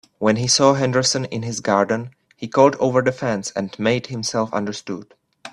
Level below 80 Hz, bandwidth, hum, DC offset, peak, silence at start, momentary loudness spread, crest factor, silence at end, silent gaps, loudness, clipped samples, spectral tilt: -58 dBFS; 12 kHz; none; under 0.1%; 0 dBFS; 0.2 s; 13 LU; 20 dB; 0.05 s; none; -19 LUFS; under 0.1%; -4 dB/octave